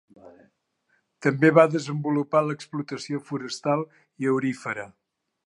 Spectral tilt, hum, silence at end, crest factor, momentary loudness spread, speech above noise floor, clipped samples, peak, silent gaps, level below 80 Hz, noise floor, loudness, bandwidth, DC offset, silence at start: -6.5 dB/octave; none; 0.6 s; 24 dB; 14 LU; 47 dB; under 0.1%; -2 dBFS; none; -76 dBFS; -71 dBFS; -25 LUFS; 11 kHz; under 0.1%; 0.25 s